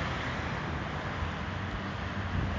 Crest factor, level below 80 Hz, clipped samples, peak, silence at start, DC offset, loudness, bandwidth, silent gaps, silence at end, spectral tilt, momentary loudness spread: 14 dB; -42 dBFS; under 0.1%; -20 dBFS; 0 s; under 0.1%; -35 LUFS; 7.6 kHz; none; 0 s; -6 dB/octave; 2 LU